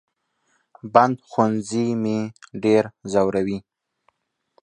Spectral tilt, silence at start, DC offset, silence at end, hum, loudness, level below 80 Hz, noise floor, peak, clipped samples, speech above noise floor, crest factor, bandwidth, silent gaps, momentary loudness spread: -6.5 dB/octave; 0.85 s; under 0.1%; 1 s; none; -21 LUFS; -60 dBFS; -69 dBFS; 0 dBFS; under 0.1%; 48 dB; 22 dB; 9.6 kHz; none; 10 LU